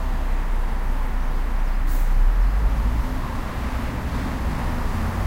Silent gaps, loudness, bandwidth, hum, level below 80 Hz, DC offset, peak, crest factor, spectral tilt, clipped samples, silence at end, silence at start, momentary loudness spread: none; -26 LUFS; 16 kHz; none; -20 dBFS; under 0.1%; -8 dBFS; 12 dB; -6.5 dB/octave; under 0.1%; 0 s; 0 s; 5 LU